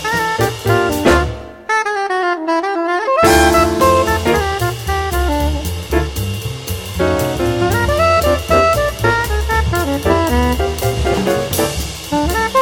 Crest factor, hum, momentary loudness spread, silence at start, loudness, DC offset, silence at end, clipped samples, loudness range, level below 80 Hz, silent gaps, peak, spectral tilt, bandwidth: 14 dB; none; 7 LU; 0 s; -15 LUFS; under 0.1%; 0 s; under 0.1%; 4 LU; -24 dBFS; none; 0 dBFS; -5 dB/octave; 17.5 kHz